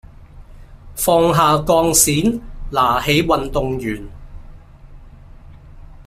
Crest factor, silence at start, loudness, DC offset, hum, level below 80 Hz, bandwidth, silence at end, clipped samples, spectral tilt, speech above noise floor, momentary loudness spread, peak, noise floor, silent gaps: 18 dB; 0.2 s; -16 LUFS; under 0.1%; none; -36 dBFS; 16 kHz; 0.05 s; under 0.1%; -4 dB/octave; 24 dB; 15 LU; 0 dBFS; -39 dBFS; none